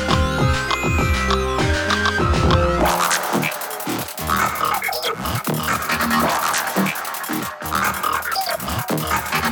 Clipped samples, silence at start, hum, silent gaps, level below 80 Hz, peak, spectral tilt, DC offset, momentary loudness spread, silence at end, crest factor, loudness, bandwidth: under 0.1%; 0 s; none; none; -32 dBFS; -4 dBFS; -4 dB/octave; under 0.1%; 7 LU; 0 s; 16 dB; -20 LUFS; 19.5 kHz